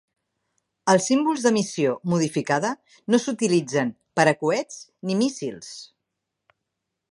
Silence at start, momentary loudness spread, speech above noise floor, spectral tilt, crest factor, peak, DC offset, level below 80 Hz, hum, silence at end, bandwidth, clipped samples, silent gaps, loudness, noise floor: 0.85 s; 14 LU; 59 dB; -5 dB/octave; 22 dB; -2 dBFS; under 0.1%; -70 dBFS; none; 1.25 s; 11.5 kHz; under 0.1%; none; -23 LUFS; -82 dBFS